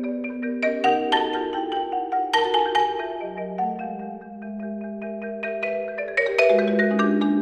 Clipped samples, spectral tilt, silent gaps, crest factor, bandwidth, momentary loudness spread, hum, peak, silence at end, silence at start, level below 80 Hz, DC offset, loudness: under 0.1%; -5.5 dB/octave; none; 18 dB; 9.8 kHz; 13 LU; none; -6 dBFS; 0 s; 0 s; -62 dBFS; under 0.1%; -23 LUFS